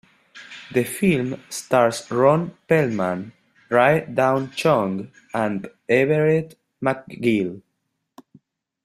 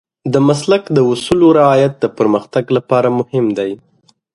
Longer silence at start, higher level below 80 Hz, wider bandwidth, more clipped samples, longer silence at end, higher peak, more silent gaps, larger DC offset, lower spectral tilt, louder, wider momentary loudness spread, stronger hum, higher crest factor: about the same, 0.35 s vs 0.25 s; second, -60 dBFS vs -50 dBFS; first, 15 kHz vs 11.5 kHz; neither; first, 1.25 s vs 0.6 s; about the same, -2 dBFS vs 0 dBFS; neither; neither; about the same, -6 dB/octave vs -6.5 dB/octave; second, -21 LUFS vs -13 LUFS; first, 13 LU vs 8 LU; neither; first, 20 dB vs 14 dB